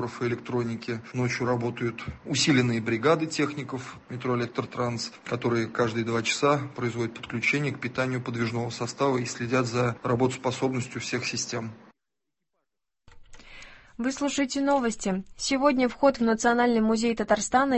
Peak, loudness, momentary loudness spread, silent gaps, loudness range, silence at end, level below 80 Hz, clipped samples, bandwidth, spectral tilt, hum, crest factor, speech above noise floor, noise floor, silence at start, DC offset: -8 dBFS; -27 LUFS; 10 LU; none; 7 LU; 0 s; -56 dBFS; under 0.1%; 8.6 kHz; -5 dB/octave; none; 20 dB; 60 dB; -86 dBFS; 0 s; under 0.1%